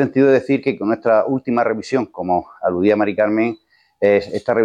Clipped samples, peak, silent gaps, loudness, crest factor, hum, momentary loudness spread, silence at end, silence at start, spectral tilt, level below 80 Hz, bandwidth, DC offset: under 0.1%; -4 dBFS; none; -18 LUFS; 14 dB; none; 7 LU; 0 s; 0 s; -7.5 dB/octave; -58 dBFS; 9.4 kHz; under 0.1%